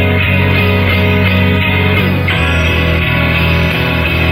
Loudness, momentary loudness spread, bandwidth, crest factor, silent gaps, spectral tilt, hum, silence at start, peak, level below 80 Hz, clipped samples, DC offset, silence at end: -11 LUFS; 2 LU; 16 kHz; 10 dB; none; -6.5 dB/octave; none; 0 s; 0 dBFS; -28 dBFS; under 0.1%; under 0.1%; 0 s